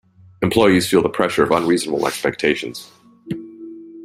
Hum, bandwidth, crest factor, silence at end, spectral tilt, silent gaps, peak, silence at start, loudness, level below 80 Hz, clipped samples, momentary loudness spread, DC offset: none; 16 kHz; 18 dB; 0 s; -5 dB/octave; none; 0 dBFS; 0.4 s; -17 LUFS; -52 dBFS; under 0.1%; 20 LU; under 0.1%